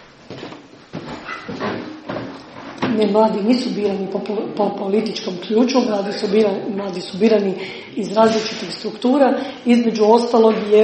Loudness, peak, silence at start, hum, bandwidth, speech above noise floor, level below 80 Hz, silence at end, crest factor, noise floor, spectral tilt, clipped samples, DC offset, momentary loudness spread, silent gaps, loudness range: -18 LUFS; 0 dBFS; 0.3 s; none; 8.8 kHz; 21 dB; -60 dBFS; 0 s; 18 dB; -38 dBFS; -6 dB/octave; under 0.1%; under 0.1%; 17 LU; none; 4 LU